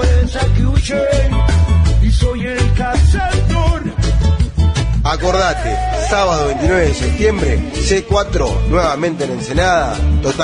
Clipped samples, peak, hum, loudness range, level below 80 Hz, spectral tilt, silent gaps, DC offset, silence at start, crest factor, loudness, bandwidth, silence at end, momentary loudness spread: under 0.1%; 0 dBFS; none; 1 LU; -16 dBFS; -5.5 dB/octave; none; under 0.1%; 0 s; 12 dB; -15 LUFS; 10.5 kHz; 0 s; 4 LU